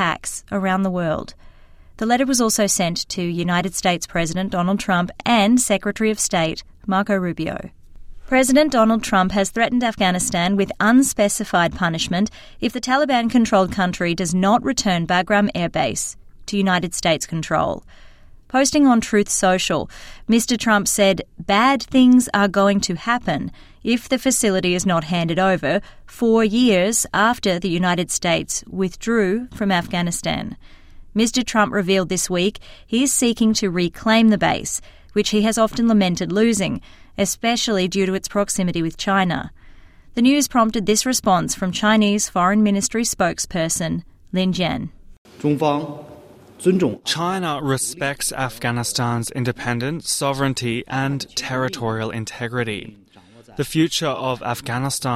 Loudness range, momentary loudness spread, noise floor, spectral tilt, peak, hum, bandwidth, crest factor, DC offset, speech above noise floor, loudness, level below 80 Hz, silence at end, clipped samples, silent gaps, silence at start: 5 LU; 9 LU; -48 dBFS; -4 dB/octave; -4 dBFS; none; 16 kHz; 16 dB; under 0.1%; 29 dB; -19 LUFS; -44 dBFS; 0 s; under 0.1%; 45.18-45.25 s; 0 s